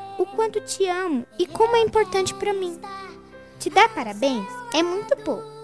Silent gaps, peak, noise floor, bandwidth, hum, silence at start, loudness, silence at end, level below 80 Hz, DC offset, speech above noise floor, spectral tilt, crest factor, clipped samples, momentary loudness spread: none; -4 dBFS; -44 dBFS; 11 kHz; none; 0 s; -23 LUFS; 0 s; -56 dBFS; 0.2%; 22 dB; -3.5 dB/octave; 20 dB; under 0.1%; 13 LU